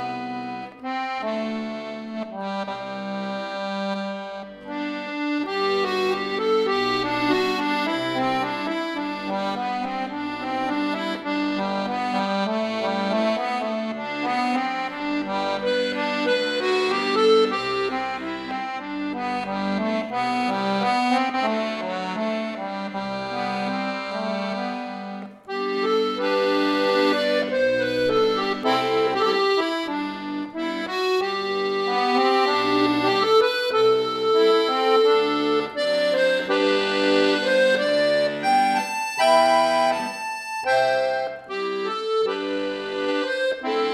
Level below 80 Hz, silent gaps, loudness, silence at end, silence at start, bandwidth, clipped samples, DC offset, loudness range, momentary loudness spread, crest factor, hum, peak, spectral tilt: -62 dBFS; none; -23 LUFS; 0 s; 0 s; 14.5 kHz; under 0.1%; under 0.1%; 8 LU; 10 LU; 18 dB; none; -6 dBFS; -4.5 dB/octave